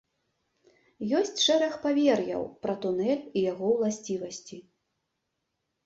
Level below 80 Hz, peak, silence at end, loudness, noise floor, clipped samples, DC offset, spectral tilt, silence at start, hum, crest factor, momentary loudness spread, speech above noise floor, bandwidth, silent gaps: -70 dBFS; -12 dBFS; 1.25 s; -28 LUFS; -81 dBFS; under 0.1%; under 0.1%; -4 dB/octave; 1 s; none; 18 dB; 14 LU; 54 dB; 8 kHz; none